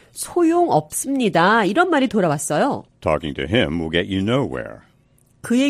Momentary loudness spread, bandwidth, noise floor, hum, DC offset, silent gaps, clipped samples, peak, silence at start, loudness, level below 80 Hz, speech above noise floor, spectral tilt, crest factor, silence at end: 9 LU; 15 kHz; -57 dBFS; none; under 0.1%; none; under 0.1%; -2 dBFS; 0.15 s; -19 LUFS; -46 dBFS; 38 dB; -5 dB/octave; 16 dB; 0 s